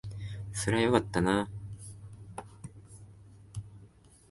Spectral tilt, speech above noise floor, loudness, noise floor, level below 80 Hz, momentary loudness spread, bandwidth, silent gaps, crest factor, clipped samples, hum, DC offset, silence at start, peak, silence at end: -5.5 dB/octave; 29 dB; -30 LUFS; -57 dBFS; -54 dBFS; 24 LU; 12 kHz; none; 24 dB; under 0.1%; none; under 0.1%; 0.05 s; -10 dBFS; 0.45 s